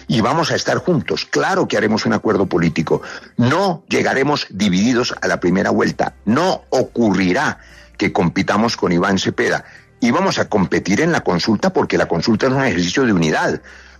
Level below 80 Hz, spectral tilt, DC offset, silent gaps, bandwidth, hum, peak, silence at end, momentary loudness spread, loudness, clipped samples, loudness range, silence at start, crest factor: -48 dBFS; -5.5 dB/octave; under 0.1%; none; 13 kHz; none; -2 dBFS; 0.15 s; 4 LU; -17 LUFS; under 0.1%; 1 LU; 0 s; 14 dB